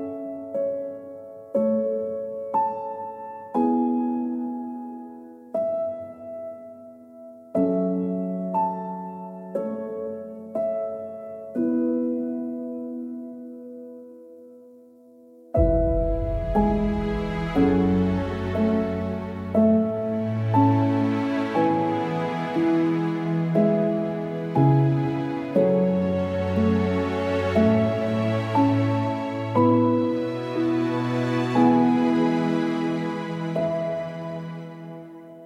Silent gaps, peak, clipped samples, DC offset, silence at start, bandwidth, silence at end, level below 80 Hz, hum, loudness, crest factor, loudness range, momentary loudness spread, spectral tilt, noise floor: none; -6 dBFS; under 0.1%; under 0.1%; 0 s; 9.4 kHz; 0 s; -40 dBFS; none; -24 LUFS; 18 dB; 7 LU; 16 LU; -9 dB/octave; -50 dBFS